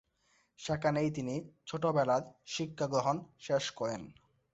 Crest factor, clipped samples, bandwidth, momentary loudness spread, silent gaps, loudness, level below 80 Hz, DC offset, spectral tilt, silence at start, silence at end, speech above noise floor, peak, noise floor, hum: 18 dB; under 0.1%; 8.2 kHz; 11 LU; none; -34 LUFS; -68 dBFS; under 0.1%; -5.5 dB/octave; 0.6 s; 0.4 s; 39 dB; -16 dBFS; -73 dBFS; none